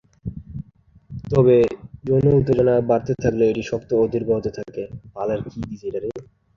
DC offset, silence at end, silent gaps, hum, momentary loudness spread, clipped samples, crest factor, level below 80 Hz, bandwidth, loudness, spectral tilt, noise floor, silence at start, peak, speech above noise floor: under 0.1%; 0.35 s; none; none; 18 LU; under 0.1%; 18 dB; -44 dBFS; 7.2 kHz; -20 LUFS; -8.5 dB/octave; -51 dBFS; 0.25 s; -4 dBFS; 32 dB